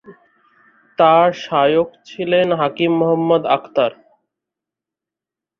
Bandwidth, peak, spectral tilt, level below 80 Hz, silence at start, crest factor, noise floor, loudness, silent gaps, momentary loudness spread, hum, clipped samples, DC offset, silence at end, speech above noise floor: 6.8 kHz; -2 dBFS; -7 dB/octave; -64 dBFS; 0.1 s; 16 dB; -87 dBFS; -16 LUFS; none; 9 LU; none; under 0.1%; under 0.1%; 1.65 s; 72 dB